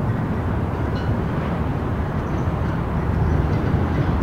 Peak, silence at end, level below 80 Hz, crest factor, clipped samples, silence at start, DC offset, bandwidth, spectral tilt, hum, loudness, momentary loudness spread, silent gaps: -8 dBFS; 0 s; -28 dBFS; 14 dB; under 0.1%; 0 s; 0.5%; 7.4 kHz; -9 dB/octave; none; -23 LUFS; 3 LU; none